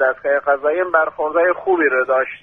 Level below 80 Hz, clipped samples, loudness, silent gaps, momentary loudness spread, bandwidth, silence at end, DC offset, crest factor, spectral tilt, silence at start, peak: -60 dBFS; under 0.1%; -17 LUFS; none; 3 LU; 3.7 kHz; 0.05 s; under 0.1%; 16 dB; -7 dB/octave; 0 s; -2 dBFS